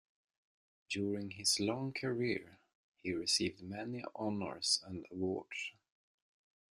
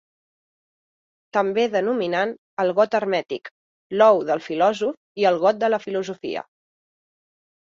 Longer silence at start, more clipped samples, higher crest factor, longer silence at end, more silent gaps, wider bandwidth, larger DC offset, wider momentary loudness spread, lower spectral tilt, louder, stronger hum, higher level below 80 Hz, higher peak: second, 0.9 s vs 1.35 s; neither; about the same, 22 dB vs 20 dB; second, 1.05 s vs 1.2 s; second, 2.75-2.92 s vs 2.38-2.57 s, 3.51-3.90 s, 4.97-5.15 s; first, 14 kHz vs 7.4 kHz; neither; about the same, 11 LU vs 12 LU; second, -3 dB/octave vs -5.5 dB/octave; second, -37 LUFS vs -21 LUFS; neither; about the same, -76 dBFS vs -72 dBFS; second, -18 dBFS vs -4 dBFS